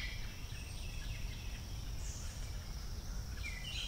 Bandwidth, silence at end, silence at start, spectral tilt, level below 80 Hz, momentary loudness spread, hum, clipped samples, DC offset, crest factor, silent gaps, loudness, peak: 16 kHz; 0 s; 0 s; -3.5 dB/octave; -44 dBFS; 3 LU; none; under 0.1%; under 0.1%; 14 dB; none; -45 LUFS; -30 dBFS